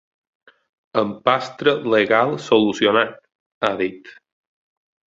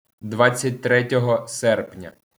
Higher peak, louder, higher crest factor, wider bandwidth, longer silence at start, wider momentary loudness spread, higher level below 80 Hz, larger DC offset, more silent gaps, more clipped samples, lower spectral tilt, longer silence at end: about the same, 0 dBFS vs -2 dBFS; about the same, -19 LUFS vs -20 LUFS; about the same, 20 dB vs 20 dB; second, 7.8 kHz vs over 20 kHz; first, 0.95 s vs 0.25 s; second, 9 LU vs 14 LU; first, -62 dBFS vs -68 dBFS; neither; first, 3.35-3.61 s vs none; neither; about the same, -5 dB/octave vs -5 dB/octave; first, 0.95 s vs 0.3 s